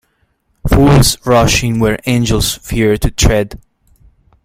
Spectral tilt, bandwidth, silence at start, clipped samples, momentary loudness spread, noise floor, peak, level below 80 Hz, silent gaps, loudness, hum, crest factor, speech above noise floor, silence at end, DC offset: -5 dB/octave; 16.5 kHz; 0.65 s; under 0.1%; 7 LU; -60 dBFS; 0 dBFS; -22 dBFS; none; -12 LUFS; none; 12 dB; 49 dB; 0.85 s; under 0.1%